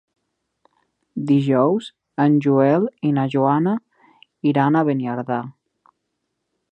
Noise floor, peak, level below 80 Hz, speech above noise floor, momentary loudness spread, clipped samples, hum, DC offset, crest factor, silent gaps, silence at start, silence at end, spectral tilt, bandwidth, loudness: -76 dBFS; -2 dBFS; -72 dBFS; 58 dB; 11 LU; under 0.1%; none; under 0.1%; 18 dB; none; 1.15 s; 1.2 s; -9 dB/octave; 8.4 kHz; -19 LUFS